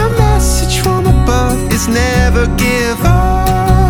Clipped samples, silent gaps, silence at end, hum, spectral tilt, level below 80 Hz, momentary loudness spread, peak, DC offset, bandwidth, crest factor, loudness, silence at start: under 0.1%; none; 0 s; none; -5.5 dB/octave; -14 dBFS; 2 LU; 0 dBFS; under 0.1%; 18.5 kHz; 10 dB; -12 LUFS; 0 s